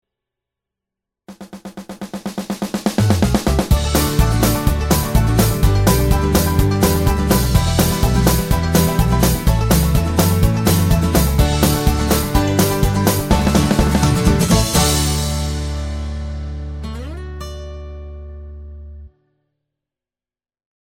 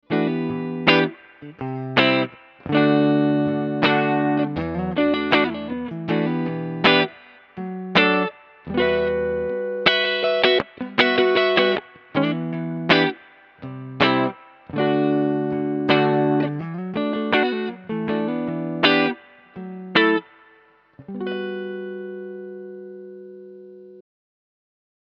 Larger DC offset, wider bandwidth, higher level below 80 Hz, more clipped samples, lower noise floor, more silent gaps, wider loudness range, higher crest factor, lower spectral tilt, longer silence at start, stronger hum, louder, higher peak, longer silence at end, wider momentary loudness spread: neither; first, 17 kHz vs 6.6 kHz; first, -22 dBFS vs -56 dBFS; neither; first, under -90 dBFS vs -55 dBFS; neither; first, 14 LU vs 6 LU; about the same, 16 dB vs 20 dB; second, -5 dB/octave vs -7 dB/octave; first, 1.3 s vs 0.1 s; second, none vs 50 Hz at -60 dBFS; first, -16 LUFS vs -21 LUFS; about the same, 0 dBFS vs 0 dBFS; first, 1.85 s vs 1 s; about the same, 17 LU vs 18 LU